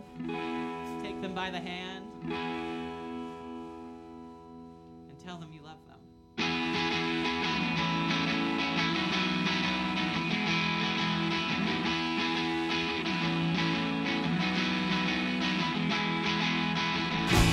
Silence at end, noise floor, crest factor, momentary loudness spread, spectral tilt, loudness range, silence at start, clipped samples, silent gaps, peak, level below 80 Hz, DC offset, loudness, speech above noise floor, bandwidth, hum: 0 s; -55 dBFS; 20 dB; 16 LU; -5 dB/octave; 11 LU; 0 s; under 0.1%; none; -12 dBFS; -48 dBFS; under 0.1%; -30 LUFS; 17 dB; 15.5 kHz; none